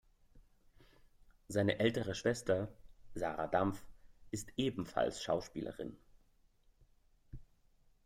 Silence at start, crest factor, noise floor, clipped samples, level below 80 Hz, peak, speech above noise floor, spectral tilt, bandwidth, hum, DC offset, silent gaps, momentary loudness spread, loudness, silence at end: 0.35 s; 22 dB; -70 dBFS; under 0.1%; -62 dBFS; -18 dBFS; 33 dB; -5.5 dB/octave; 16 kHz; none; under 0.1%; none; 18 LU; -38 LUFS; 0.6 s